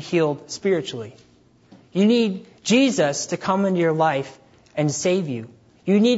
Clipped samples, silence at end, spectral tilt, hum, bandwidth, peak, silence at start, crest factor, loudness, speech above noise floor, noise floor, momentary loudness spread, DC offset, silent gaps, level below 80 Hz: under 0.1%; 0 s; -5 dB/octave; none; 8 kHz; -6 dBFS; 0 s; 16 dB; -21 LUFS; 31 dB; -52 dBFS; 14 LU; under 0.1%; none; -66 dBFS